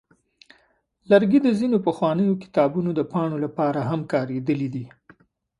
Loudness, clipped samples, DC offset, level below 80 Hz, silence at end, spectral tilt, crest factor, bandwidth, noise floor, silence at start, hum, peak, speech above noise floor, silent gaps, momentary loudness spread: -22 LUFS; under 0.1%; under 0.1%; -64 dBFS; 0.7 s; -8.5 dB/octave; 20 dB; 11 kHz; -64 dBFS; 1.1 s; none; -2 dBFS; 43 dB; none; 7 LU